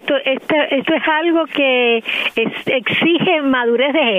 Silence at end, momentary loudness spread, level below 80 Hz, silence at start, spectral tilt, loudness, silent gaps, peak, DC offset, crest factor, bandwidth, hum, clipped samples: 0 s; 4 LU; -60 dBFS; 0.05 s; -6 dB/octave; -15 LUFS; none; -4 dBFS; under 0.1%; 12 dB; 15 kHz; none; under 0.1%